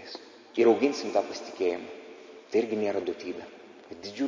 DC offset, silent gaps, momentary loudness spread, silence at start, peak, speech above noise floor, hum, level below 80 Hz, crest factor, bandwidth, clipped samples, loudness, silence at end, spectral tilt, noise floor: under 0.1%; none; 23 LU; 0 s; -10 dBFS; 20 dB; none; -72 dBFS; 18 dB; 7.6 kHz; under 0.1%; -28 LUFS; 0 s; -4.5 dB/octave; -48 dBFS